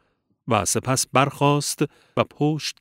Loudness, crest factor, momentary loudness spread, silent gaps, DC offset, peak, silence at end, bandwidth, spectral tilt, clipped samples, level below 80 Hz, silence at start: -22 LUFS; 20 dB; 7 LU; none; under 0.1%; -2 dBFS; 0.1 s; 16 kHz; -4 dB/octave; under 0.1%; -58 dBFS; 0.45 s